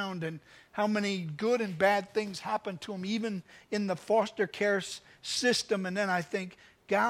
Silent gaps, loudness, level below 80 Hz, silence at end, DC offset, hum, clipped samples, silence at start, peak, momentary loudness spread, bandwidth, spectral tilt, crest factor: none; -31 LUFS; -72 dBFS; 0 s; under 0.1%; none; under 0.1%; 0 s; -12 dBFS; 12 LU; 15.5 kHz; -4 dB/octave; 20 dB